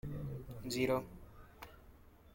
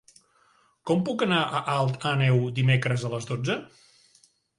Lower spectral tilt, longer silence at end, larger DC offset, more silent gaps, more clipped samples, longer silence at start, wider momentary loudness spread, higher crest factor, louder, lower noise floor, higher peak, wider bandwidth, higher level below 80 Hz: about the same, -5.5 dB/octave vs -6 dB/octave; second, 0 s vs 0.95 s; neither; neither; neither; second, 0.05 s vs 0.85 s; first, 23 LU vs 7 LU; about the same, 20 dB vs 18 dB; second, -39 LUFS vs -25 LUFS; about the same, -60 dBFS vs -63 dBFS; second, -22 dBFS vs -10 dBFS; first, 16.5 kHz vs 11 kHz; about the same, -58 dBFS vs -60 dBFS